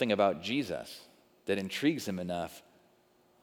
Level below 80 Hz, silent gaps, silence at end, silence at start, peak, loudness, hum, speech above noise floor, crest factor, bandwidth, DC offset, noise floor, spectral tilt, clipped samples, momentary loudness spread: -74 dBFS; none; 0.85 s; 0 s; -14 dBFS; -33 LUFS; none; 35 dB; 20 dB; 19 kHz; under 0.1%; -67 dBFS; -5 dB/octave; under 0.1%; 17 LU